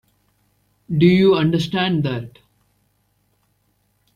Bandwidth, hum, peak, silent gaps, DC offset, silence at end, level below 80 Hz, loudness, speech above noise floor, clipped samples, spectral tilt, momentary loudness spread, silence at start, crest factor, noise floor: 9.4 kHz; 60 Hz at -40 dBFS; -2 dBFS; none; under 0.1%; 1.85 s; -54 dBFS; -17 LUFS; 49 dB; under 0.1%; -7.5 dB/octave; 14 LU; 0.9 s; 18 dB; -65 dBFS